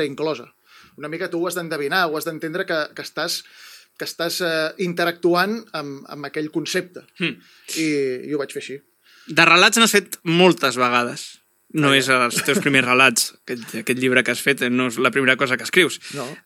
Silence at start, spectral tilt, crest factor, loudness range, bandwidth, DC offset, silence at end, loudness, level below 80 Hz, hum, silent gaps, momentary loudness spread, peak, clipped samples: 0 s; -3 dB/octave; 20 dB; 8 LU; 17.5 kHz; under 0.1%; 0.05 s; -19 LUFS; -76 dBFS; none; none; 16 LU; 0 dBFS; under 0.1%